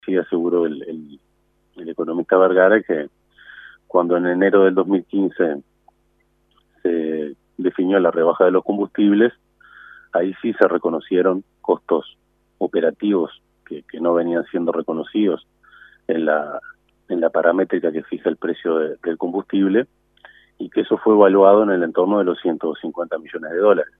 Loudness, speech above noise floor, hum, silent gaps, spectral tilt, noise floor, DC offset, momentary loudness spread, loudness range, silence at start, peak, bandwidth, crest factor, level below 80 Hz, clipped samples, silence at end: -19 LUFS; 45 dB; none; none; -9.5 dB/octave; -64 dBFS; under 0.1%; 13 LU; 5 LU; 0.05 s; 0 dBFS; 3.9 kHz; 20 dB; -66 dBFS; under 0.1%; 0.15 s